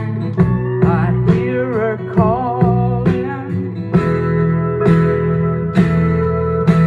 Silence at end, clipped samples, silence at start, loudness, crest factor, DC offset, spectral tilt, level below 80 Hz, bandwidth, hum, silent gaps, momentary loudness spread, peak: 0 s; under 0.1%; 0 s; -16 LUFS; 14 dB; under 0.1%; -10 dB/octave; -36 dBFS; 4.8 kHz; none; none; 5 LU; 0 dBFS